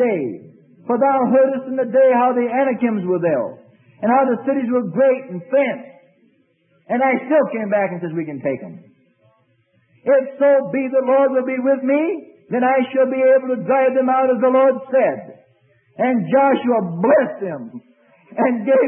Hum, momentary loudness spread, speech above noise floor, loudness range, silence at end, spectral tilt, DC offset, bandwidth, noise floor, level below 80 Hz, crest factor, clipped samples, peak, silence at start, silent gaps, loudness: none; 10 LU; 44 dB; 5 LU; 0 s; -12 dB/octave; under 0.1%; 3.4 kHz; -61 dBFS; -74 dBFS; 14 dB; under 0.1%; -4 dBFS; 0 s; none; -17 LUFS